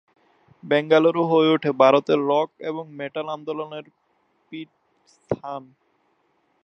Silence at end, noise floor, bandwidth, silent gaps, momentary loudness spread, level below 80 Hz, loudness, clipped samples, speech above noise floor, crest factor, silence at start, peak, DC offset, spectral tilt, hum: 1.05 s; -67 dBFS; 6.4 kHz; none; 21 LU; -68 dBFS; -21 LUFS; under 0.1%; 46 dB; 22 dB; 0.65 s; -2 dBFS; under 0.1%; -7 dB/octave; none